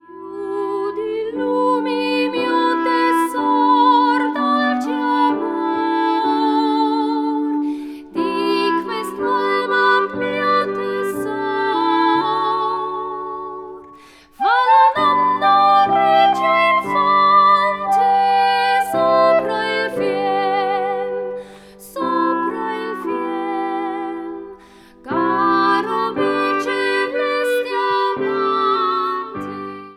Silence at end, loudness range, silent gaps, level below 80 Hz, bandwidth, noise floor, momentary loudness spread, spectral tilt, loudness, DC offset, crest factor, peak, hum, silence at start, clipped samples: 0.05 s; 7 LU; none; -60 dBFS; 15.5 kHz; -45 dBFS; 12 LU; -4.5 dB/octave; -17 LUFS; under 0.1%; 14 dB; -2 dBFS; none; 0.1 s; under 0.1%